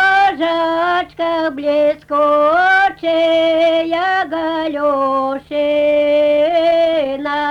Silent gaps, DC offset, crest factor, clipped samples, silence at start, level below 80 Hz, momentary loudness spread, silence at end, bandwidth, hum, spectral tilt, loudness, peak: none; under 0.1%; 10 dB; under 0.1%; 0 s; -52 dBFS; 7 LU; 0 s; 8.4 kHz; none; -4.5 dB/octave; -15 LUFS; -4 dBFS